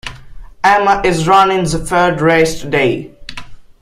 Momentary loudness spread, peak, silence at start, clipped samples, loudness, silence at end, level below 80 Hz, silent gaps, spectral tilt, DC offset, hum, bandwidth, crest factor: 20 LU; 0 dBFS; 0.05 s; under 0.1%; -12 LUFS; 0.2 s; -34 dBFS; none; -5 dB/octave; under 0.1%; none; 15 kHz; 14 dB